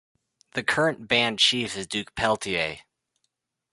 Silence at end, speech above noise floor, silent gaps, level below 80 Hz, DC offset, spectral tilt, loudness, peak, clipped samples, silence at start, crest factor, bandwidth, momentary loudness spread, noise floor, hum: 0.95 s; 53 dB; none; -58 dBFS; under 0.1%; -3 dB/octave; -24 LUFS; -6 dBFS; under 0.1%; 0.55 s; 22 dB; 11.5 kHz; 11 LU; -78 dBFS; none